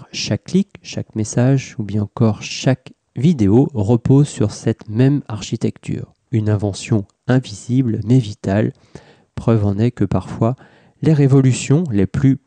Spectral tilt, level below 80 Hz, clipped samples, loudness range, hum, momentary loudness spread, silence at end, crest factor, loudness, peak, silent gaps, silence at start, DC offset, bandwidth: -7 dB/octave; -48 dBFS; under 0.1%; 3 LU; none; 10 LU; 0.1 s; 14 dB; -18 LUFS; -4 dBFS; none; 0 s; under 0.1%; 9.4 kHz